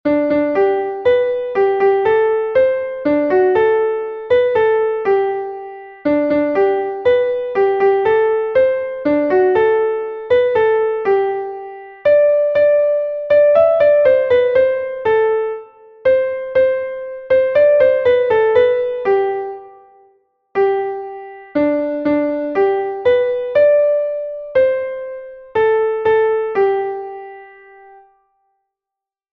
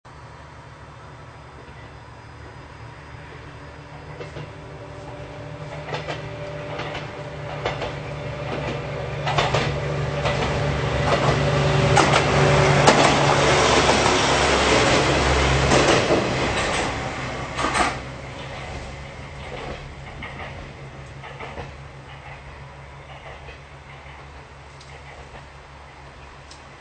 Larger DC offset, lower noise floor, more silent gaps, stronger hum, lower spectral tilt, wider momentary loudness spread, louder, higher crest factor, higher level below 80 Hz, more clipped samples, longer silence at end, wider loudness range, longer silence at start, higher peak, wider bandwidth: neither; first, -86 dBFS vs -42 dBFS; neither; neither; first, -7.5 dB/octave vs -4.5 dB/octave; second, 12 LU vs 25 LU; first, -15 LUFS vs -20 LUFS; second, 14 dB vs 24 dB; second, -54 dBFS vs -36 dBFS; neither; first, 1.85 s vs 0 s; second, 5 LU vs 23 LU; about the same, 0.05 s vs 0.05 s; about the same, -2 dBFS vs 0 dBFS; second, 5.2 kHz vs 9.2 kHz